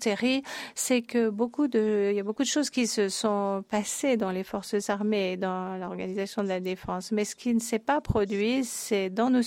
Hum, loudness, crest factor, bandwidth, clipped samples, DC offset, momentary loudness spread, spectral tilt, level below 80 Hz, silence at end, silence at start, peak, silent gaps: none; -28 LUFS; 16 dB; 16 kHz; under 0.1%; under 0.1%; 6 LU; -4 dB/octave; -52 dBFS; 0 s; 0 s; -12 dBFS; none